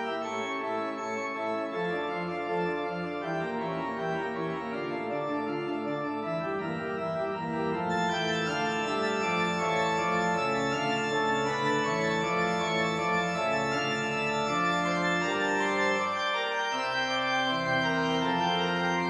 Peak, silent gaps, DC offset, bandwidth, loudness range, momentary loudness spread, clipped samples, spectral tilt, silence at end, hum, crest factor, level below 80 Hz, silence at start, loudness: -16 dBFS; none; under 0.1%; 11 kHz; 5 LU; 6 LU; under 0.1%; -4.5 dB/octave; 0 s; none; 14 dB; -64 dBFS; 0 s; -29 LUFS